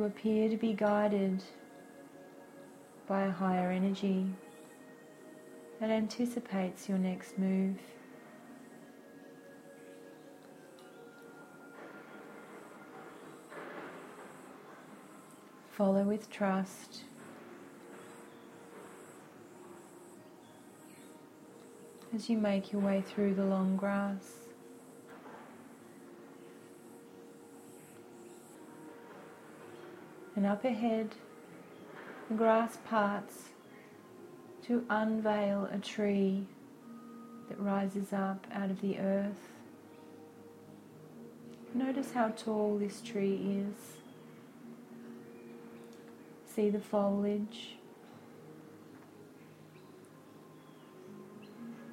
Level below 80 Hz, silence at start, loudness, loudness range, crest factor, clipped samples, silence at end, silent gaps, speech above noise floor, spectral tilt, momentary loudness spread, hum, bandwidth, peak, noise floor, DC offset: -80 dBFS; 0 s; -34 LUFS; 19 LU; 22 dB; under 0.1%; 0 s; none; 23 dB; -7 dB/octave; 22 LU; none; 15.5 kHz; -14 dBFS; -56 dBFS; under 0.1%